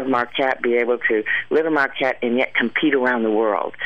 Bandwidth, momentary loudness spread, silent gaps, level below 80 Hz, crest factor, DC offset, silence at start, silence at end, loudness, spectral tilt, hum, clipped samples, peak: 7.4 kHz; 3 LU; none; -64 dBFS; 14 dB; 0.7%; 0 s; 0 s; -19 LUFS; -6 dB/octave; none; under 0.1%; -6 dBFS